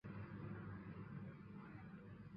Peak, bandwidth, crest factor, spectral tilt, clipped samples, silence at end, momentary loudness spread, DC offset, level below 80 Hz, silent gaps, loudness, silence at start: -40 dBFS; 5.4 kHz; 14 dB; -8 dB/octave; under 0.1%; 0 s; 5 LU; under 0.1%; -70 dBFS; none; -54 LUFS; 0.05 s